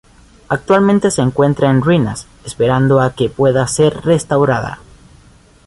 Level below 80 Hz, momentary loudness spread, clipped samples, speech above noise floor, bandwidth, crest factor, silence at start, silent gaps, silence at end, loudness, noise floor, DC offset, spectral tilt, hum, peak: -42 dBFS; 10 LU; under 0.1%; 32 dB; 11.5 kHz; 14 dB; 0.5 s; none; 0.9 s; -14 LUFS; -45 dBFS; under 0.1%; -6 dB/octave; none; -2 dBFS